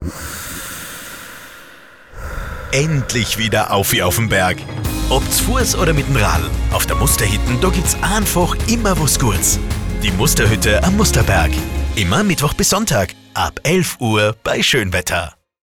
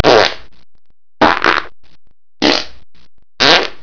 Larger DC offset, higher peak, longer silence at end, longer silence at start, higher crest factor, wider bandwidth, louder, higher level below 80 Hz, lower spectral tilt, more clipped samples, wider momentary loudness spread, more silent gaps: second, under 0.1% vs 5%; about the same, -2 dBFS vs 0 dBFS; first, 0.35 s vs 0.1 s; about the same, 0 s vs 0 s; about the same, 14 dB vs 16 dB; first, 19 kHz vs 5.4 kHz; second, -16 LUFS vs -12 LUFS; first, -24 dBFS vs -44 dBFS; about the same, -4 dB/octave vs -3 dB/octave; second, under 0.1% vs 0.9%; first, 13 LU vs 9 LU; neither